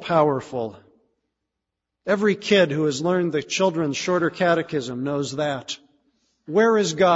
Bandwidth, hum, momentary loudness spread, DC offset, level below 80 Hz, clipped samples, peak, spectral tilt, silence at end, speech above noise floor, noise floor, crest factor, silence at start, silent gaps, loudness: 8 kHz; none; 12 LU; under 0.1%; -64 dBFS; under 0.1%; -4 dBFS; -5 dB/octave; 0 s; 61 dB; -82 dBFS; 18 dB; 0 s; none; -22 LUFS